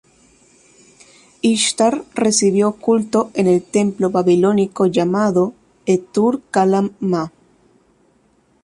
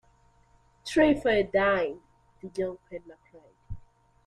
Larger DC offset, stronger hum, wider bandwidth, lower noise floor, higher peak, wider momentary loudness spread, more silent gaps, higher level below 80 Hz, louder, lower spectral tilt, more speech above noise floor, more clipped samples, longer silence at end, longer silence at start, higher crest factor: neither; neither; about the same, 11.5 kHz vs 12 kHz; second, -58 dBFS vs -62 dBFS; first, -2 dBFS vs -10 dBFS; second, 6 LU vs 24 LU; neither; second, -58 dBFS vs -52 dBFS; first, -17 LUFS vs -26 LUFS; about the same, -5 dB/octave vs -5.5 dB/octave; first, 42 dB vs 36 dB; neither; first, 1.35 s vs 0.45 s; first, 1.45 s vs 0.85 s; about the same, 16 dB vs 20 dB